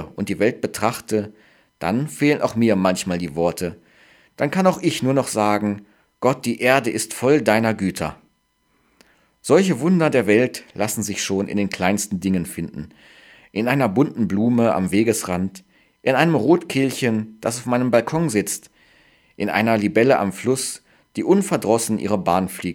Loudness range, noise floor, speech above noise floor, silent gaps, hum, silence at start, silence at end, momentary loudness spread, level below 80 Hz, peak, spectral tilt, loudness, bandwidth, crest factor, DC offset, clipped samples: 2 LU; -65 dBFS; 46 dB; none; none; 0 s; 0 s; 10 LU; -56 dBFS; 0 dBFS; -5.5 dB/octave; -20 LUFS; 18 kHz; 20 dB; under 0.1%; under 0.1%